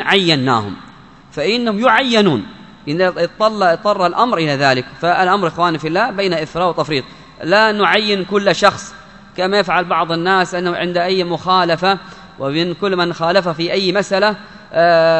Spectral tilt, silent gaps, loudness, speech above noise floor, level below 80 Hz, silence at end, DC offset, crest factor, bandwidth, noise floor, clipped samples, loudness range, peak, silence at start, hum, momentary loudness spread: -5 dB/octave; none; -15 LUFS; 26 dB; -52 dBFS; 0 s; 0.2%; 16 dB; 11 kHz; -41 dBFS; under 0.1%; 2 LU; 0 dBFS; 0 s; none; 9 LU